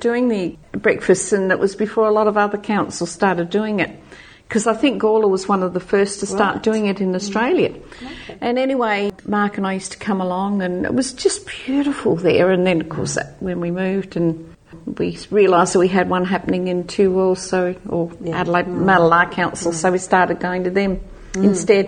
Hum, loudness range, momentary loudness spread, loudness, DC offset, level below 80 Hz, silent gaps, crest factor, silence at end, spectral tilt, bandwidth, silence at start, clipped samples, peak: none; 3 LU; 9 LU; -18 LUFS; under 0.1%; -46 dBFS; none; 18 dB; 0 s; -5 dB/octave; 9.8 kHz; 0 s; under 0.1%; -2 dBFS